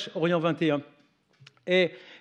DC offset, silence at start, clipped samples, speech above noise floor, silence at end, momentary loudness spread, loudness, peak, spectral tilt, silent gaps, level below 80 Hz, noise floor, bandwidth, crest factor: under 0.1%; 0 s; under 0.1%; 34 dB; 0.05 s; 7 LU; -26 LUFS; -12 dBFS; -6.5 dB/octave; none; -88 dBFS; -60 dBFS; 8.8 kHz; 16 dB